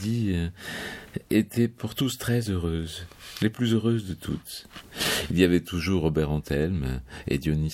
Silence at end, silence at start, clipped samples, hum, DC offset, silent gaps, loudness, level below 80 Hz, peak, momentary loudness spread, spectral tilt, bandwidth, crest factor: 0 s; 0 s; under 0.1%; none; under 0.1%; none; -27 LUFS; -42 dBFS; -6 dBFS; 12 LU; -5.5 dB/octave; 16.5 kHz; 20 dB